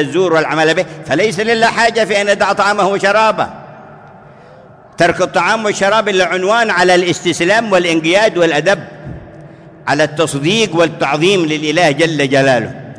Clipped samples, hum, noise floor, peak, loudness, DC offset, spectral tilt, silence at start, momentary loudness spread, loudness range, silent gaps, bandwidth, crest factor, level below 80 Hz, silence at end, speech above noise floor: under 0.1%; none; -39 dBFS; 0 dBFS; -12 LUFS; under 0.1%; -4 dB/octave; 0 s; 6 LU; 3 LU; none; 11 kHz; 14 dB; -48 dBFS; 0 s; 27 dB